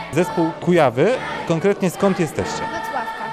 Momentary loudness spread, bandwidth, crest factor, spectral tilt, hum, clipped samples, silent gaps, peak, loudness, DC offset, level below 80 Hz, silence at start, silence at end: 8 LU; 15.5 kHz; 16 dB; -6 dB/octave; none; under 0.1%; none; -4 dBFS; -20 LUFS; 0.1%; -52 dBFS; 0 s; 0 s